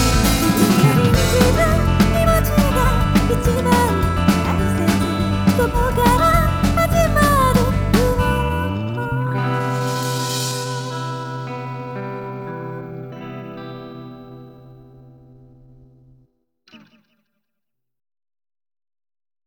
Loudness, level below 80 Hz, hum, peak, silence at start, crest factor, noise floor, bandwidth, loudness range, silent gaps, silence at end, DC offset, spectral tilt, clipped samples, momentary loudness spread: -17 LUFS; -26 dBFS; none; -2 dBFS; 0 s; 16 dB; -83 dBFS; over 20 kHz; 17 LU; none; 2.7 s; under 0.1%; -5.5 dB/octave; under 0.1%; 17 LU